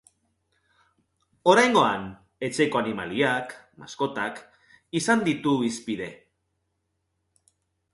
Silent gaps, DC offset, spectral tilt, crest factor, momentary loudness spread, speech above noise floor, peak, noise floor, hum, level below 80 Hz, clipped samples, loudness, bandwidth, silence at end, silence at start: none; under 0.1%; -4.5 dB/octave; 22 dB; 19 LU; 53 dB; -4 dBFS; -77 dBFS; none; -64 dBFS; under 0.1%; -24 LUFS; 11.5 kHz; 1.8 s; 1.45 s